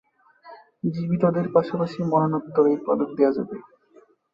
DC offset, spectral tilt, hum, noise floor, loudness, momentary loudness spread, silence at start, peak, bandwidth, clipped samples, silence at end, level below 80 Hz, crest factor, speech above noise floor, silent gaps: under 0.1%; -10 dB/octave; none; -56 dBFS; -23 LUFS; 9 LU; 0.45 s; -6 dBFS; 7.2 kHz; under 0.1%; 0.7 s; -64 dBFS; 18 dB; 34 dB; none